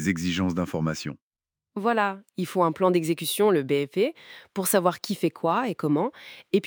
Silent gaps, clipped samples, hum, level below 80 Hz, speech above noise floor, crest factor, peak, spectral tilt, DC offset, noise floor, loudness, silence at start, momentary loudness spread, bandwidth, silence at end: 1.22-1.31 s; under 0.1%; none; -64 dBFS; 61 dB; 18 dB; -6 dBFS; -5 dB/octave; under 0.1%; -87 dBFS; -25 LUFS; 0 s; 11 LU; over 20 kHz; 0 s